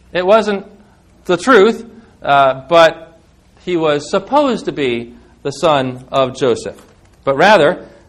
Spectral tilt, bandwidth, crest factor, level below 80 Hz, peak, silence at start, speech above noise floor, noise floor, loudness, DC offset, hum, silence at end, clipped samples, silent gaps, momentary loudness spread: -5 dB/octave; 12 kHz; 14 dB; -50 dBFS; 0 dBFS; 0.15 s; 34 dB; -47 dBFS; -13 LUFS; under 0.1%; none; 0.25 s; 0.3%; none; 16 LU